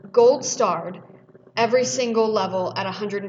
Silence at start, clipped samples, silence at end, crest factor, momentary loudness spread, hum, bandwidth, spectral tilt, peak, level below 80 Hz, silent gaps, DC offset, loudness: 0.05 s; under 0.1%; 0 s; 18 dB; 13 LU; none; 7.8 kHz; -3.5 dB/octave; -4 dBFS; -80 dBFS; none; under 0.1%; -21 LUFS